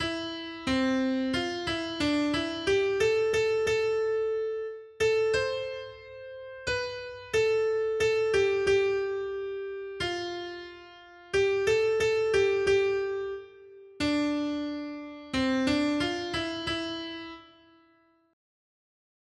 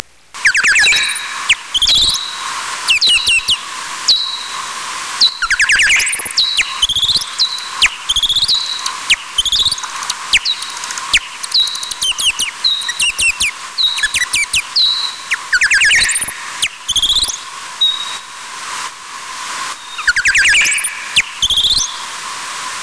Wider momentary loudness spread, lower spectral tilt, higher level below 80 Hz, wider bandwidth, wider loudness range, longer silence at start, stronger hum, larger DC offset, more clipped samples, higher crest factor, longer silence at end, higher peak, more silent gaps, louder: about the same, 14 LU vs 14 LU; first, -4.5 dB/octave vs 2 dB/octave; second, -56 dBFS vs -40 dBFS; about the same, 11.5 kHz vs 11 kHz; about the same, 4 LU vs 3 LU; second, 0 s vs 0.35 s; neither; second, under 0.1% vs 0.4%; neither; about the same, 14 dB vs 16 dB; first, 1.9 s vs 0 s; second, -14 dBFS vs 0 dBFS; neither; second, -28 LUFS vs -12 LUFS